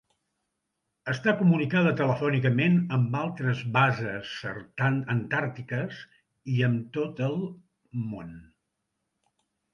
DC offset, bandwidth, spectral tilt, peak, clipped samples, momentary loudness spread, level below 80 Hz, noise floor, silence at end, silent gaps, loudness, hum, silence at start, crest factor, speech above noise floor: under 0.1%; 6.8 kHz; -8 dB/octave; -8 dBFS; under 0.1%; 14 LU; -64 dBFS; -81 dBFS; 1.3 s; none; -27 LUFS; none; 1.05 s; 20 dB; 55 dB